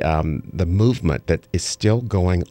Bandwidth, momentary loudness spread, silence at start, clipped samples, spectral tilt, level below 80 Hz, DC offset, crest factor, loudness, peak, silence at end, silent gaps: 11.5 kHz; 6 LU; 0 s; under 0.1%; -6 dB/octave; -32 dBFS; under 0.1%; 16 dB; -21 LUFS; -4 dBFS; 0.05 s; none